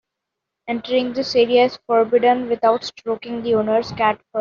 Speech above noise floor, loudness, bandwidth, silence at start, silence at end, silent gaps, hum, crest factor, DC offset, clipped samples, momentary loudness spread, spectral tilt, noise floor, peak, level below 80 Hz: 63 dB; -19 LUFS; 7.2 kHz; 0.65 s; 0 s; none; none; 16 dB; under 0.1%; under 0.1%; 11 LU; -2.5 dB/octave; -81 dBFS; -2 dBFS; -58 dBFS